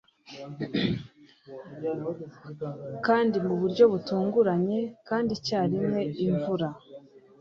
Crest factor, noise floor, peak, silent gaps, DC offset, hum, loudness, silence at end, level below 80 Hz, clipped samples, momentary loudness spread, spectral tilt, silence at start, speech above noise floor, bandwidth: 20 dB; -49 dBFS; -8 dBFS; none; under 0.1%; none; -27 LUFS; 0.2 s; -64 dBFS; under 0.1%; 20 LU; -7 dB/octave; 0.3 s; 22 dB; 7.2 kHz